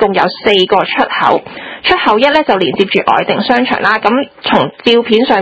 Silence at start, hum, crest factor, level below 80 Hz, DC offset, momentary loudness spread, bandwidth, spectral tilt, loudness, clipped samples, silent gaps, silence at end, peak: 0 s; none; 12 dB; -46 dBFS; under 0.1%; 4 LU; 8 kHz; -5.5 dB/octave; -11 LUFS; 0.5%; none; 0 s; 0 dBFS